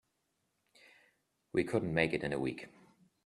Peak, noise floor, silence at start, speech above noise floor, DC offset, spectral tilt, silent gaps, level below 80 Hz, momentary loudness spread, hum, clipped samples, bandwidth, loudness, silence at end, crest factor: -14 dBFS; -81 dBFS; 1.55 s; 47 dB; under 0.1%; -6.5 dB/octave; none; -66 dBFS; 13 LU; none; under 0.1%; 12.5 kHz; -35 LUFS; 0.55 s; 24 dB